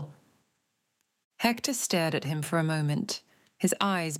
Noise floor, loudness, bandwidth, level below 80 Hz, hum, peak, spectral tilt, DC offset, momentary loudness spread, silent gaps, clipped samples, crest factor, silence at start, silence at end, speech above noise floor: -78 dBFS; -29 LUFS; 16.5 kHz; -74 dBFS; none; -8 dBFS; -4.5 dB/octave; under 0.1%; 6 LU; 1.24-1.31 s; under 0.1%; 22 dB; 0 s; 0 s; 50 dB